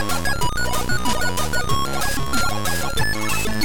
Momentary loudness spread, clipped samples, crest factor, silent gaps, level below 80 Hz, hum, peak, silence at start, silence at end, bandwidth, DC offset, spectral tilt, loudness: 1 LU; under 0.1%; 14 dB; none; -32 dBFS; none; -6 dBFS; 0 s; 0 s; 19 kHz; 9%; -3 dB/octave; -22 LUFS